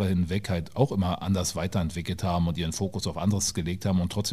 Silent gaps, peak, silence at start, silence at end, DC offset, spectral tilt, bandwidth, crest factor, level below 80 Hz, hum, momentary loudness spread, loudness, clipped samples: none; -8 dBFS; 0 s; 0 s; 0.3%; -5.5 dB/octave; 15.5 kHz; 18 dB; -44 dBFS; none; 4 LU; -28 LUFS; under 0.1%